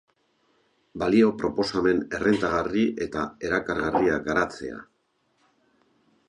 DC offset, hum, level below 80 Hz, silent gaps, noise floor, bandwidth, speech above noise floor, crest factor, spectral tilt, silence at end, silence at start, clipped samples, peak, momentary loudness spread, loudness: under 0.1%; none; -52 dBFS; none; -71 dBFS; 10.5 kHz; 46 dB; 18 dB; -6 dB/octave; 1.45 s; 0.95 s; under 0.1%; -8 dBFS; 10 LU; -25 LUFS